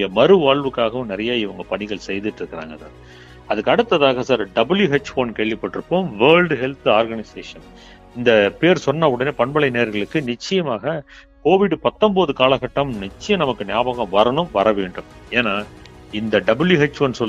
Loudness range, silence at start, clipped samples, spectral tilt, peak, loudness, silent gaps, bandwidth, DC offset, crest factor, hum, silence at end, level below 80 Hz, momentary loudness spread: 3 LU; 0 s; under 0.1%; -6 dB/octave; 0 dBFS; -18 LUFS; none; 8.2 kHz; under 0.1%; 18 dB; none; 0 s; -48 dBFS; 13 LU